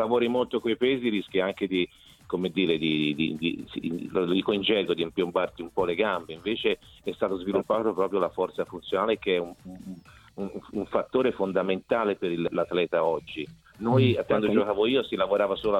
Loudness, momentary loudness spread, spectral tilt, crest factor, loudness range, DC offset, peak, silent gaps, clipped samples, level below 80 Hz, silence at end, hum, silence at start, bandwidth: -27 LUFS; 10 LU; -7 dB/octave; 18 dB; 3 LU; under 0.1%; -8 dBFS; none; under 0.1%; -58 dBFS; 0 s; none; 0 s; 13 kHz